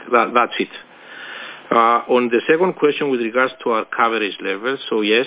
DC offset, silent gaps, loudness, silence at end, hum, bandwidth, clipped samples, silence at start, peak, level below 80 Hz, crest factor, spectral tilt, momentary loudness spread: under 0.1%; none; -18 LUFS; 0 s; none; 4 kHz; under 0.1%; 0 s; -2 dBFS; -72 dBFS; 18 dB; -8.5 dB/octave; 16 LU